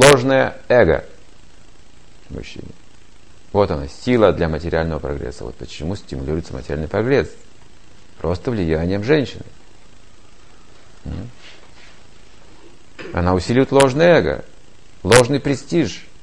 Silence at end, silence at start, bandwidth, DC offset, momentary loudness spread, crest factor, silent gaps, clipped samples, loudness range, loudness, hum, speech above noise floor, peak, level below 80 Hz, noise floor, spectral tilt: 0.2 s; 0 s; 13 kHz; 2%; 20 LU; 20 dB; none; under 0.1%; 11 LU; -18 LUFS; none; 31 dB; 0 dBFS; -36 dBFS; -48 dBFS; -5 dB/octave